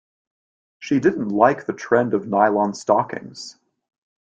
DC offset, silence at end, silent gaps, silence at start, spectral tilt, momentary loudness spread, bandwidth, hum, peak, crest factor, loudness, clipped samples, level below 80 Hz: under 0.1%; 0.85 s; none; 0.8 s; -6 dB/octave; 18 LU; 9.2 kHz; none; -2 dBFS; 20 dB; -20 LUFS; under 0.1%; -64 dBFS